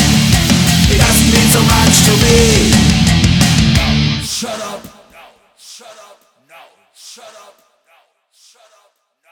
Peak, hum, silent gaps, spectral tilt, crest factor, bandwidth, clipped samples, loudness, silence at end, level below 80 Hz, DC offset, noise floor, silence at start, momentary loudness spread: 0 dBFS; none; none; -4 dB/octave; 14 dB; over 20 kHz; under 0.1%; -10 LUFS; 2.05 s; -24 dBFS; under 0.1%; -57 dBFS; 0 s; 11 LU